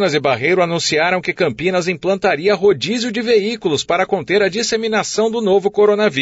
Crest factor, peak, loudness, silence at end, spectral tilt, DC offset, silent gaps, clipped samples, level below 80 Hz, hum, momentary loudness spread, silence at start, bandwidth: 12 dB; -4 dBFS; -16 LUFS; 0 s; -4 dB/octave; under 0.1%; none; under 0.1%; -54 dBFS; none; 4 LU; 0 s; 8 kHz